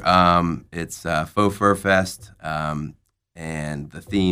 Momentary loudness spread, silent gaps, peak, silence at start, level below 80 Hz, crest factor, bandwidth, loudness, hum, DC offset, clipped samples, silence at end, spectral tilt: 15 LU; none; -2 dBFS; 0 s; -48 dBFS; 20 dB; 16 kHz; -22 LUFS; none; under 0.1%; under 0.1%; 0 s; -5.5 dB/octave